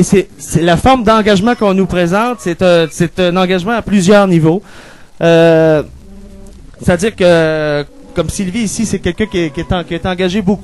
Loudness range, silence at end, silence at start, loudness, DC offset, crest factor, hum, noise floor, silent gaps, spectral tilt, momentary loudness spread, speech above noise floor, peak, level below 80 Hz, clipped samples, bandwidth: 4 LU; 0 s; 0 s; -12 LUFS; 0.7%; 12 dB; none; -34 dBFS; none; -5.5 dB/octave; 9 LU; 23 dB; 0 dBFS; -32 dBFS; under 0.1%; 12.5 kHz